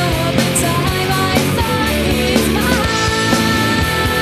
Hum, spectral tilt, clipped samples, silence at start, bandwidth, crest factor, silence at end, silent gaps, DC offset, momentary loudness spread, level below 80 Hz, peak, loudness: none; -4 dB/octave; under 0.1%; 0 s; 14.5 kHz; 14 dB; 0 s; none; under 0.1%; 2 LU; -28 dBFS; 0 dBFS; -15 LUFS